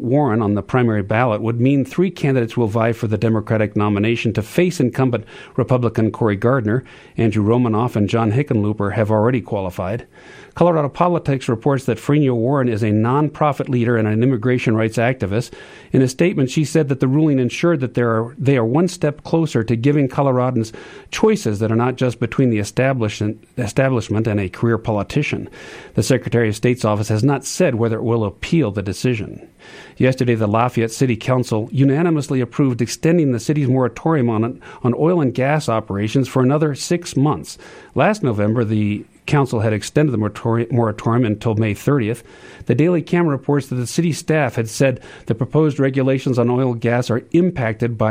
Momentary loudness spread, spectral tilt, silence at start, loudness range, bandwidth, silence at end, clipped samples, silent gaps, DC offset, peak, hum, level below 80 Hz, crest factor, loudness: 6 LU; -7 dB/octave; 0 s; 2 LU; 15.5 kHz; 0 s; under 0.1%; none; under 0.1%; 0 dBFS; none; -50 dBFS; 16 dB; -18 LUFS